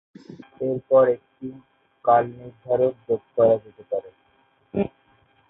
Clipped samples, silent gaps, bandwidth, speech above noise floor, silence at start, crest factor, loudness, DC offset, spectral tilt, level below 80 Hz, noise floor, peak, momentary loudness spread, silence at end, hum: under 0.1%; none; 3.9 kHz; 41 dB; 0.3 s; 18 dB; -23 LUFS; under 0.1%; -10 dB/octave; -60 dBFS; -63 dBFS; -6 dBFS; 20 LU; 0.65 s; none